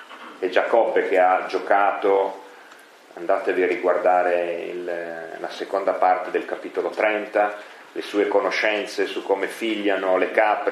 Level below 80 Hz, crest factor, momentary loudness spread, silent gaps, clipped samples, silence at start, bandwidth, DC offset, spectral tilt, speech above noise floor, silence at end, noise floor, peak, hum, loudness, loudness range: -86 dBFS; 20 dB; 11 LU; none; under 0.1%; 0 s; 13.5 kHz; under 0.1%; -4 dB/octave; 26 dB; 0 s; -47 dBFS; -2 dBFS; none; -22 LUFS; 3 LU